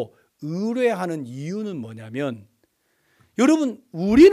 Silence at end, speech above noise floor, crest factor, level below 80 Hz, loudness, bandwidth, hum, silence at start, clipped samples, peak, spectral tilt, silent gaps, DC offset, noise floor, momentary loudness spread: 0 s; 47 dB; 18 dB; -50 dBFS; -23 LUFS; 13 kHz; none; 0 s; under 0.1%; -4 dBFS; -6.5 dB/octave; none; under 0.1%; -67 dBFS; 16 LU